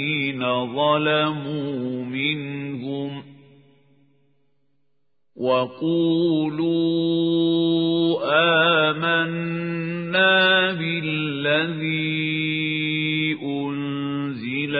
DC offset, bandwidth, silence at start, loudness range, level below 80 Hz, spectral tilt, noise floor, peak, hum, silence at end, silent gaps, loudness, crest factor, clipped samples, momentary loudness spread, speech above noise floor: under 0.1%; 4.9 kHz; 0 s; 10 LU; -72 dBFS; -10.5 dB/octave; -77 dBFS; -6 dBFS; none; 0 s; none; -21 LUFS; 18 dB; under 0.1%; 11 LU; 56 dB